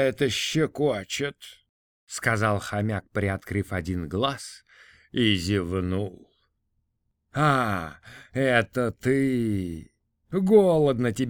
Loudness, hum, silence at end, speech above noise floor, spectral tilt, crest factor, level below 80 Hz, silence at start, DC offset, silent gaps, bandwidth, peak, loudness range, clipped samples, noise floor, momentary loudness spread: -25 LUFS; none; 0 s; 51 dB; -5.5 dB/octave; 20 dB; -52 dBFS; 0 s; under 0.1%; 1.69-2.07 s; 19 kHz; -6 dBFS; 4 LU; under 0.1%; -75 dBFS; 14 LU